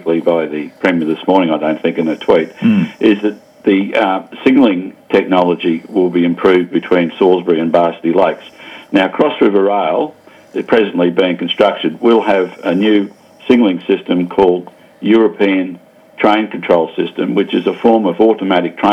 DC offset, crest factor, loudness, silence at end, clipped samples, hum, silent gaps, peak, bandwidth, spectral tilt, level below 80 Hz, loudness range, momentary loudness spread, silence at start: under 0.1%; 14 dB; -13 LUFS; 0 s; under 0.1%; none; none; 0 dBFS; 8.4 kHz; -7.5 dB/octave; -54 dBFS; 1 LU; 6 LU; 0.05 s